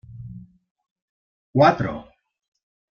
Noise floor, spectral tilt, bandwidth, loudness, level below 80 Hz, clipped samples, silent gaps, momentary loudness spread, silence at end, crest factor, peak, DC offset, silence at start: -41 dBFS; -7.5 dB/octave; 6.8 kHz; -20 LUFS; -54 dBFS; under 0.1%; 0.71-0.75 s, 0.91-0.96 s, 1.02-1.54 s; 22 LU; 0.9 s; 22 dB; -4 dBFS; under 0.1%; 0.1 s